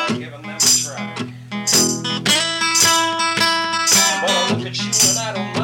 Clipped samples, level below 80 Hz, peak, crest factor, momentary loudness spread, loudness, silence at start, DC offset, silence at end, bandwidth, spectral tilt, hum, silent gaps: under 0.1%; -58 dBFS; -6 dBFS; 12 dB; 13 LU; -15 LUFS; 0 s; under 0.1%; 0 s; 17 kHz; -1.5 dB/octave; none; none